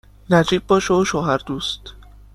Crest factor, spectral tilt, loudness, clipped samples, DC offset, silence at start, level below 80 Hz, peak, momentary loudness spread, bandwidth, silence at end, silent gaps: 18 dB; -5 dB/octave; -19 LUFS; under 0.1%; under 0.1%; 0.3 s; -42 dBFS; -2 dBFS; 9 LU; 13 kHz; 0.35 s; none